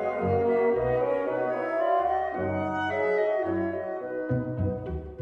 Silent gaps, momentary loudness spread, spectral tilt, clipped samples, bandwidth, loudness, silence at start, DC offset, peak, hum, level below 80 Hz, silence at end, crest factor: none; 7 LU; -9 dB/octave; under 0.1%; 7.2 kHz; -27 LUFS; 0 s; under 0.1%; -14 dBFS; none; -50 dBFS; 0 s; 14 dB